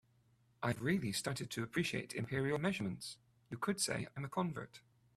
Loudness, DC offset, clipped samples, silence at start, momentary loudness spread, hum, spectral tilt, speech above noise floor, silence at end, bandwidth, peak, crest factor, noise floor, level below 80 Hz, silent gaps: -39 LUFS; under 0.1%; under 0.1%; 0.6 s; 12 LU; none; -4.5 dB/octave; 33 dB; 0.4 s; 15 kHz; -20 dBFS; 20 dB; -72 dBFS; -70 dBFS; none